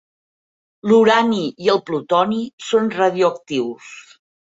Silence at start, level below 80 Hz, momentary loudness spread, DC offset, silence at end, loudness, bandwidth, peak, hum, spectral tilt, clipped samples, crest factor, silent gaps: 0.85 s; -64 dBFS; 13 LU; under 0.1%; 0.4 s; -18 LUFS; 7.8 kHz; -2 dBFS; none; -5 dB/octave; under 0.1%; 16 dB; 2.53-2.58 s